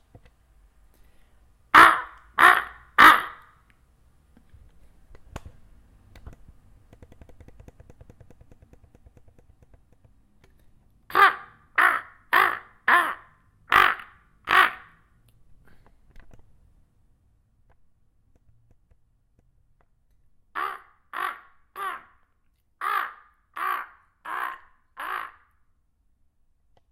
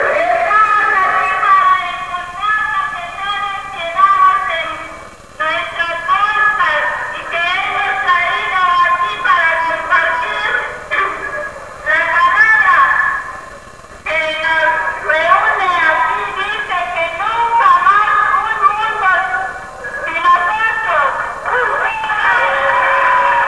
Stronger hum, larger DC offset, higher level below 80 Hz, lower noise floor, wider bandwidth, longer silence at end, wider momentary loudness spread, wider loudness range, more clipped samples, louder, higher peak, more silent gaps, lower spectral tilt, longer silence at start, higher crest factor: neither; second, under 0.1% vs 0.5%; second, -56 dBFS vs -46 dBFS; first, -67 dBFS vs -35 dBFS; first, 16 kHz vs 11 kHz; first, 1.65 s vs 0 s; first, 29 LU vs 11 LU; first, 18 LU vs 3 LU; neither; second, -21 LUFS vs -13 LUFS; about the same, 0 dBFS vs 0 dBFS; neither; about the same, -2 dB/octave vs -2 dB/octave; first, 1.75 s vs 0 s; first, 26 dB vs 14 dB